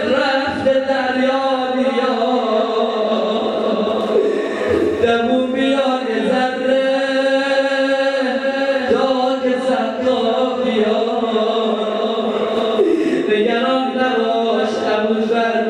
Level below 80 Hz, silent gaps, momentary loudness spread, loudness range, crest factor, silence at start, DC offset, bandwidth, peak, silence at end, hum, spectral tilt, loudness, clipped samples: -58 dBFS; none; 3 LU; 1 LU; 14 dB; 0 s; under 0.1%; 10 kHz; -2 dBFS; 0 s; none; -5 dB/octave; -17 LUFS; under 0.1%